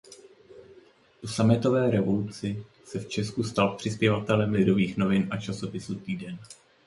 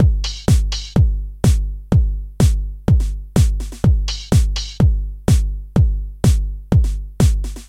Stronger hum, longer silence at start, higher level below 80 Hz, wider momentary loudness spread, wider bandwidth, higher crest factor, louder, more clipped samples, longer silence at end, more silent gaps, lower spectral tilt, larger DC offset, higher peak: neither; about the same, 0.1 s vs 0 s; second, -56 dBFS vs -18 dBFS; first, 14 LU vs 4 LU; second, 11.5 kHz vs 15 kHz; about the same, 20 dB vs 16 dB; second, -27 LUFS vs -18 LUFS; neither; first, 0.3 s vs 0.05 s; neither; about the same, -6.5 dB/octave vs -6.5 dB/octave; neither; second, -8 dBFS vs 0 dBFS